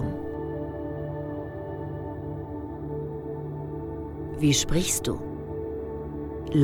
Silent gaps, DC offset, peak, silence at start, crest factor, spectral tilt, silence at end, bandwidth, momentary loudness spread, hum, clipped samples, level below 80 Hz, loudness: none; under 0.1%; -10 dBFS; 0 s; 18 dB; -4.5 dB/octave; 0 s; 19 kHz; 12 LU; none; under 0.1%; -42 dBFS; -31 LUFS